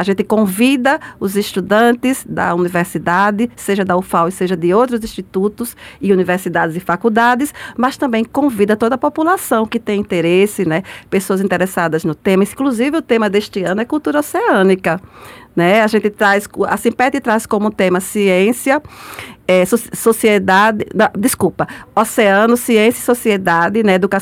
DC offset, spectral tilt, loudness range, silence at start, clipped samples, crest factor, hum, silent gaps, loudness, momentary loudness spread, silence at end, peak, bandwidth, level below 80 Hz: under 0.1%; -5 dB/octave; 3 LU; 0 s; under 0.1%; 12 dB; none; none; -14 LUFS; 7 LU; 0 s; -2 dBFS; 17 kHz; -50 dBFS